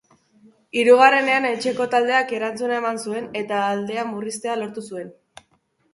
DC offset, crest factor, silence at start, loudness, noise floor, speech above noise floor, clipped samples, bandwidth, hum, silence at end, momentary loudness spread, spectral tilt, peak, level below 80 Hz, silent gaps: under 0.1%; 20 dB; 0.75 s; -20 LUFS; -65 dBFS; 45 dB; under 0.1%; 11.5 kHz; none; 0.8 s; 15 LU; -3.5 dB/octave; 0 dBFS; -70 dBFS; none